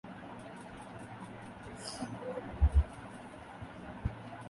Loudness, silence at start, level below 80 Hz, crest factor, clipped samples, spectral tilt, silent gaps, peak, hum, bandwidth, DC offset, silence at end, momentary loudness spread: -39 LUFS; 0.05 s; -38 dBFS; 20 dB; under 0.1%; -6.5 dB/octave; none; -16 dBFS; none; 11.5 kHz; under 0.1%; 0 s; 17 LU